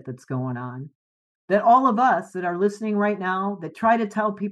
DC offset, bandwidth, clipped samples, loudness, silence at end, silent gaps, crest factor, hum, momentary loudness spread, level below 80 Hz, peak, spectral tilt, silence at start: under 0.1%; 10.5 kHz; under 0.1%; -22 LUFS; 0 s; 0.95-1.48 s; 16 dB; none; 14 LU; -76 dBFS; -6 dBFS; -7.5 dB/octave; 0.05 s